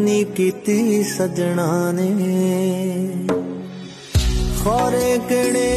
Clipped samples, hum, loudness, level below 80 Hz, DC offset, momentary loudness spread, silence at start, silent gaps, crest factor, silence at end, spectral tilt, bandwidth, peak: under 0.1%; none; -19 LUFS; -30 dBFS; under 0.1%; 5 LU; 0 s; none; 12 dB; 0 s; -5.5 dB/octave; 13.5 kHz; -6 dBFS